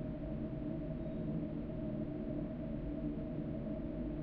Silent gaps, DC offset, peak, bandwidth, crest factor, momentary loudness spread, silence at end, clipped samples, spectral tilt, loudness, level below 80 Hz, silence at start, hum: none; under 0.1%; -28 dBFS; 4.9 kHz; 12 dB; 2 LU; 0 s; under 0.1%; -10 dB/octave; -42 LUFS; -50 dBFS; 0 s; none